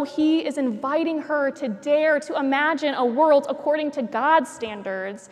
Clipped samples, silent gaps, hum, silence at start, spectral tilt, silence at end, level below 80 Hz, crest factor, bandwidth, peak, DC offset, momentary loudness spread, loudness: under 0.1%; none; none; 0 s; -4.5 dB/octave; 0.05 s; -72 dBFS; 16 dB; 11.5 kHz; -6 dBFS; under 0.1%; 10 LU; -22 LUFS